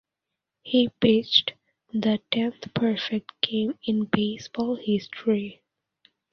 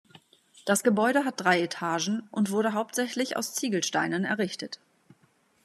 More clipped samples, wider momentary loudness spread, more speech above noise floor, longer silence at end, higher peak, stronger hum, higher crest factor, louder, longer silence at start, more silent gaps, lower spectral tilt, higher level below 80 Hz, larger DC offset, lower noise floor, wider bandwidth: neither; about the same, 8 LU vs 7 LU; first, 61 dB vs 39 dB; about the same, 0.8 s vs 0.9 s; first, -4 dBFS vs -8 dBFS; neither; about the same, 22 dB vs 20 dB; about the same, -25 LUFS vs -27 LUFS; about the same, 0.65 s vs 0.65 s; neither; first, -6 dB/octave vs -3.5 dB/octave; first, -64 dBFS vs -80 dBFS; neither; first, -85 dBFS vs -66 dBFS; second, 6.6 kHz vs 14 kHz